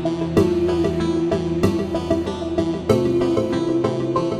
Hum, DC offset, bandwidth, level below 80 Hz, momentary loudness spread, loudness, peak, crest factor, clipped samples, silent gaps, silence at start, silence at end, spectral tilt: none; under 0.1%; 12.5 kHz; -40 dBFS; 4 LU; -20 LUFS; -4 dBFS; 16 dB; under 0.1%; none; 0 s; 0 s; -7.5 dB/octave